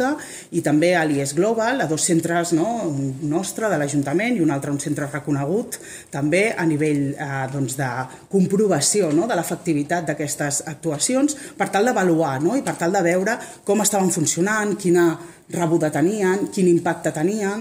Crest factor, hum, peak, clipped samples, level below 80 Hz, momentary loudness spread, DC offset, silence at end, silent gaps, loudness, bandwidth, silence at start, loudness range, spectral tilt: 16 dB; none; -4 dBFS; under 0.1%; -60 dBFS; 7 LU; under 0.1%; 0 s; none; -21 LUFS; 16 kHz; 0 s; 3 LU; -5 dB/octave